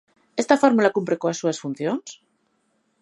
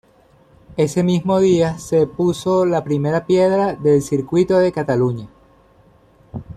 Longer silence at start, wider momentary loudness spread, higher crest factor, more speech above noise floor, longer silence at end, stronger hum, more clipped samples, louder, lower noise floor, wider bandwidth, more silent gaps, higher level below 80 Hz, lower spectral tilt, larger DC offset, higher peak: second, 0.35 s vs 0.7 s; first, 13 LU vs 6 LU; first, 22 dB vs 14 dB; first, 48 dB vs 36 dB; first, 0.85 s vs 0 s; neither; neither; second, -22 LUFS vs -17 LUFS; first, -69 dBFS vs -52 dBFS; second, 11.5 kHz vs 13.5 kHz; neither; second, -74 dBFS vs -50 dBFS; second, -5 dB/octave vs -7 dB/octave; neither; about the same, -2 dBFS vs -4 dBFS